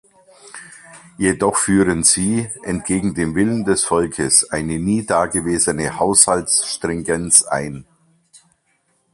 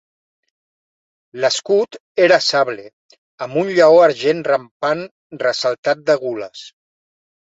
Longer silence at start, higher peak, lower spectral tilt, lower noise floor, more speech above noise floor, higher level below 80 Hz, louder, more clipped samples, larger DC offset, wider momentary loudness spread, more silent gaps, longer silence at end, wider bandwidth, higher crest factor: second, 0.45 s vs 1.35 s; about the same, 0 dBFS vs -2 dBFS; about the same, -3.5 dB/octave vs -3.5 dB/octave; second, -64 dBFS vs under -90 dBFS; second, 47 dB vs over 74 dB; first, -44 dBFS vs -68 dBFS; about the same, -16 LUFS vs -16 LUFS; neither; neither; second, 11 LU vs 19 LU; second, none vs 2.00-2.15 s, 2.93-3.09 s, 3.18-3.38 s, 4.71-4.80 s, 5.11-5.30 s, 5.78-5.83 s; first, 1.3 s vs 0.9 s; first, 14.5 kHz vs 8 kHz; about the same, 18 dB vs 16 dB